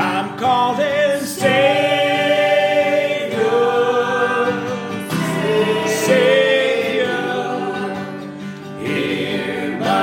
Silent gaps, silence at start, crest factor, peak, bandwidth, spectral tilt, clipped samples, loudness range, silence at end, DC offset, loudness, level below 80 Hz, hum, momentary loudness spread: none; 0 s; 16 dB; -2 dBFS; 16.5 kHz; -4.5 dB/octave; under 0.1%; 3 LU; 0 s; under 0.1%; -17 LUFS; -60 dBFS; none; 10 LU